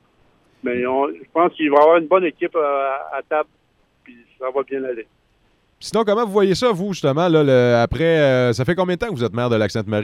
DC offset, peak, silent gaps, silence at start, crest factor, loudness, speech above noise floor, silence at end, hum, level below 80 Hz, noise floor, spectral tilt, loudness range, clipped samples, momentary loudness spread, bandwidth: under 0.1%; -2 dBFS; none; 0.65 s; 16 dB; -18 LUFS; 43 dB; 0 s; none; -48 dBFS; -60 dBFS; -6.5 dB/octave; 8 LU; under 0.1%; 11 LU; 13 kHz